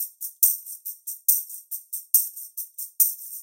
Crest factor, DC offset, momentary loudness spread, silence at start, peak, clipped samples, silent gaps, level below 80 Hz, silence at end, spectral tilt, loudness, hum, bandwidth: 24 dB; under 0.1%; 14 LU; 0 s; -2 dBFS; under 0.1%; none; under -90 dBFS; 0 s; 11.5 dB/octave; -22 LUFS; none; 17 kHz